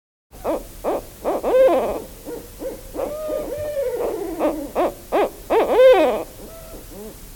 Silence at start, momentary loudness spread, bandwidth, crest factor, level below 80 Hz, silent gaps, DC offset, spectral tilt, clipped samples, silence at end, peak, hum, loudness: 0.35 s; 21 LU; 18 kHz; 18 dB; -44 dBFS; none; under 0.1%; -4.5 dB/octave; under 0.1%; 0 s; -4 dBFS; none; -20 LUFS